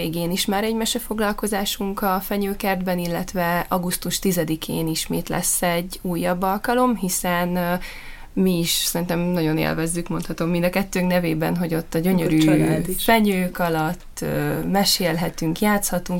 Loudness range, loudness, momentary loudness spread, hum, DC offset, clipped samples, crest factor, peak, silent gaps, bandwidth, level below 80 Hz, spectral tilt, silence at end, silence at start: 3 LU; -22 LUFS; 7 LU; none; under 0.1%; under 0.1%; 18 dB; -4 dBFS; none; 17 kHz; -38 dBFS; -4.5 dB/octave; 0 s; 0 s